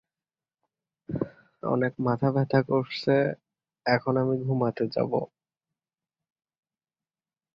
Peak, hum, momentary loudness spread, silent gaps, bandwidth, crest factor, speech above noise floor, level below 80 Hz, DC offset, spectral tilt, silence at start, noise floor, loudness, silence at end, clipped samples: -8 dBFS; none; 11 LU; none; 6.4 kHz; 22 dB; over 65 dB; -64 dBFS; under 0.1%; -9 dB/octave; 1.1 s; under -90 dBFS; -27 LUFS; 2.3 s; under 0.1%